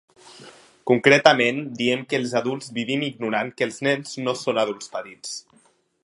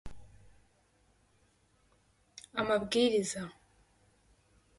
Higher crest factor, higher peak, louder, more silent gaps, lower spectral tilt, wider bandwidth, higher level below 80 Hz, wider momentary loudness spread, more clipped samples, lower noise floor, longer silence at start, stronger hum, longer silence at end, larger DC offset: about the same, 24 dB vs 22 dB; first, 0 dBFS vs -14 dBFS; first, -22 LUFS vs -32 LUFS; neither; about the same, -4 dB/octave vs -3.5 dB/octave; about the same, 11.5 kHz vs 11.5 kHz; second, -70 dBFS vs -62 dBFS; second, 18 LU vs 25 LU; neither; second, -60 dBFS vs -70 dBFS; first, 0.25 s vs 0.05 s; neither; second, 0.65 s vs 1.25 s; neither